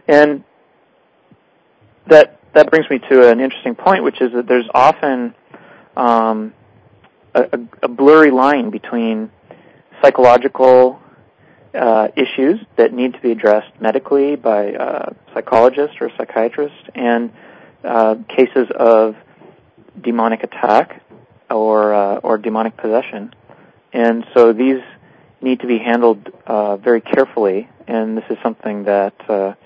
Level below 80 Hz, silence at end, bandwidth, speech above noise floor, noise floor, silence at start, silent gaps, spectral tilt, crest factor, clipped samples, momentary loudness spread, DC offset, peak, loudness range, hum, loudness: -62 dBFS; 0.1 s; 8 kHz; 42 dB; -55 dBFS; 0.1 s; none; -6.5 dB/octave; 14 dB; 0.6%; 13 LU; under 0.1%; 0 dBFS; 5 LU; none; -14 LUFS